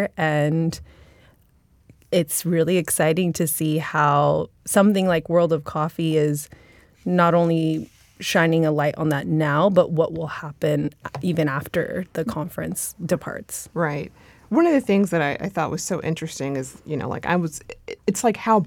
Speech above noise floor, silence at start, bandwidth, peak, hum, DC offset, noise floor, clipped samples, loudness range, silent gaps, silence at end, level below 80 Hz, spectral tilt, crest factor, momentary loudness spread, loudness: 36 dB; 0 s; 18.5 kHz; -4 dBFS; none; under 0.1%; -58 dBFS; under 0.1%; 5 LU; none; 0 s; -56 dBFS; -5.5 dB/octave; 18 dB; 12 LU; -22 LUFS